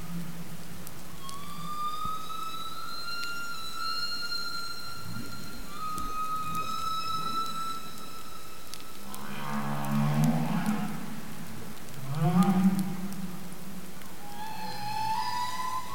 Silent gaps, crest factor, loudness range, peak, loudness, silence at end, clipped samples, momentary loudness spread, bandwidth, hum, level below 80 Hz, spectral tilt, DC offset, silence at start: none; 22 dB; 6 LU; -12 dBFS; -33 LUFS; 0 s; under 0.1%; 16 LU; 17 kHz; none; -56 dBFS; -5 dB/octave; 3%; 0 s